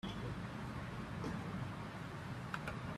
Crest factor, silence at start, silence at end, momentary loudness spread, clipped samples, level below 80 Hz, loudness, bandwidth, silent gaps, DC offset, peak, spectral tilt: 20 dB; 0.05 s; 0 s; 3 LU; under 0.1%; -58 dBFS; -45 LUFS; 14 kHz; none; under 0.1%; -26 dBFS; -6.5 dB/octave